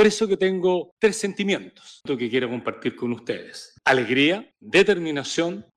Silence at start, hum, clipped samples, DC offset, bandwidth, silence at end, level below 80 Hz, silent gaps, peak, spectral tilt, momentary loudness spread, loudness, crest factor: 0 s; none; under 0.1%; under 0.1%; 12 kHz; 0.15 s; -62 dBFS; 0.92-0.97 s; -8 dBFS; -4 dB/octave; 11 LU; -23 LUFS; 16 dB